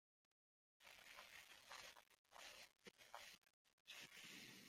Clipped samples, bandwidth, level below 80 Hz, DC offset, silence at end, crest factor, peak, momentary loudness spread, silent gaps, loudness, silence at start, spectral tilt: under 0.1%; 16.5 kHz; under -90 dBFS; under 0.1%; 0 s; 24 dB; -40 dBFS; 8 LU; 2.19-2.25 s, 3.38-3.42 s, 3.53-3.65 s, 3.73-3.85 s; -61 LUFS; 0.8 s; -1 dB/octave